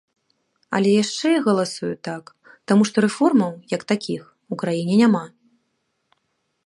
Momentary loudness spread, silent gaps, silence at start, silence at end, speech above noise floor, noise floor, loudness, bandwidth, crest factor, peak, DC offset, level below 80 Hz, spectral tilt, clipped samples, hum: 15 LU; none; 0.7 s; 1.4 s; 53 dB; -72 dBFS; -20 LUFS; 11.5 kHz; 18 dB; -4 dBFS; under 0.1%; -68 dBFS; -5.5 dB/octave; under 0.1%; none